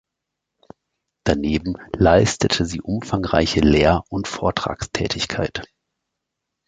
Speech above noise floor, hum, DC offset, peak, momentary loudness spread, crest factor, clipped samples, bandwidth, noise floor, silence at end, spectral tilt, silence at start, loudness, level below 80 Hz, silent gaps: 62 dB; none; under 0.1%; -2 dBFS; 11 LU; 20 dB; under 0.1%; 9.4 kHz; -82 dBFS; 1 s; -5 dB/octave; 1.25 s; -20 LUFS; -36 dBFS; none